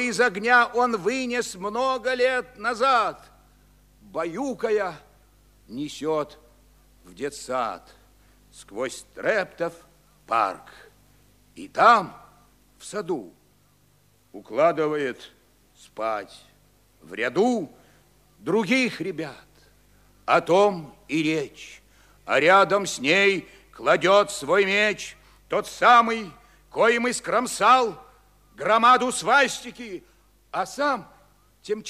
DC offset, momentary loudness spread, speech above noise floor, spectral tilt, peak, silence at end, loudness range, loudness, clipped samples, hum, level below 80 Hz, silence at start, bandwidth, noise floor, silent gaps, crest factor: under 0.1%; 19 LU; 38 dB; -3.5 dB/octave; -4 dBFS; 0 s; 10 LU; -22 LUFS; under 0.1%; 50 Hz at -60 dBFS; -60 dBFS; 0 s; 15 kHz; -61 dBFS; none; 22 dB